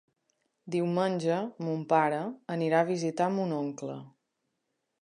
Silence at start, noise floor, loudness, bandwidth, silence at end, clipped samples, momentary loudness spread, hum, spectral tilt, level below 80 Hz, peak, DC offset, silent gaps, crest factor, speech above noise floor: 0.65 s; -82 dBFS; -30 LUFS; 10.5 kHz; 0.95 s; under 0.1%; 9 LU; none; -6.5 dB/octave; -82 dBFS; -12 dBFS; under 0.1%; none; 20 dB; 52 dB